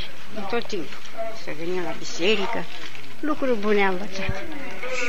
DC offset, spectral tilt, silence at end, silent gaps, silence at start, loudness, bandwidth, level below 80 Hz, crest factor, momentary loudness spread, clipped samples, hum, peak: 10%; -4.5 dB/octave; 0 s; none; 0 s; -27 LUFS; 15.5 kHz; -48 dBFS; 20 dB; 14 LU; under 0.1%; none; -10 dBFS